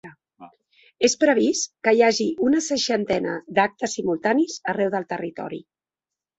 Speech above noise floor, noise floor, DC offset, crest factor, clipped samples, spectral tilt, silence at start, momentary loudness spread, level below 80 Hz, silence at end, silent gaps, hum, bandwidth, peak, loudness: 67 dB; -89 dBFS; under 0.1%; 18 dB; under 0.1%; -3.5 dB/octave; 0.05 s; 12 LU; -62 dBFS; 0.75 s; none; none; 8.2 kHz; -4 dBFS; -22 LUFS